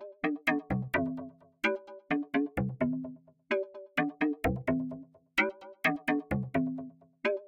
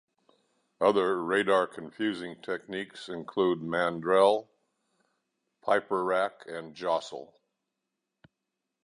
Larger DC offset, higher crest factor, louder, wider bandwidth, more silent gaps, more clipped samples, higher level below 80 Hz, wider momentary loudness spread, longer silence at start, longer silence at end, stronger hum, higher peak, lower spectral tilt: neither; about the same, 20 dB vs 20 dB; second, -33 LUFS vs -29 LUFS; first, 16.5 kHz vs 11 kHz; neither; neither; first, -54 dBFS vs -72 dBFS; second, 10 LU vs 14 LU; second, 0 s vs 0.8 s; second, 0 s vs 1.6 s; neither; about the same, -12 dBFS vs -10 dBFS; first, -7 dB/octave vs -5 dB/octave